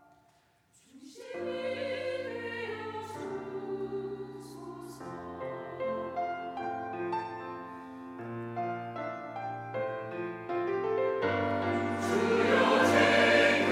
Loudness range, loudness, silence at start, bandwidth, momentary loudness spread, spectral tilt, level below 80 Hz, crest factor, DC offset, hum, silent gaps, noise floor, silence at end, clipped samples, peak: 11 LU; -31 LUFS; 0.95 s; 16 kHz; 20 LU; -5 dB/octave; -74 dBFS; 22 dB; under 0.1%; none; none; -67 dBFS; 0 s; under 0.1%; -10 dBFS